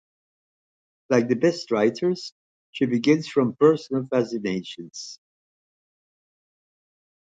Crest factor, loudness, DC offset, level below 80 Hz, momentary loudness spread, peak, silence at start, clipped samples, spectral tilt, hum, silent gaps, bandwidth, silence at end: 20 dB; -23 LUFS; under 0.1%; -70 dBFS; 17 LU; -4 dBFS; 1.1 s; under 0.1%; -6 dB/octave; none; 2.32-2.73 s; 9 kHz; 2.05 s